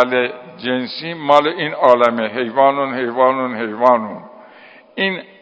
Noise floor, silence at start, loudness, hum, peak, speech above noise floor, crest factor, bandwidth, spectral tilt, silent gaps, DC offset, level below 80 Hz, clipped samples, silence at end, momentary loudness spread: -43 dBFS; 0 s; -16 LUFS; none; 0 dBFS; 27 dB; 16 dB; 8 kHz; -6 dB/octave; none; under 0.1%; -68 dBFS; 0.1%; 0.2 s; 11 LU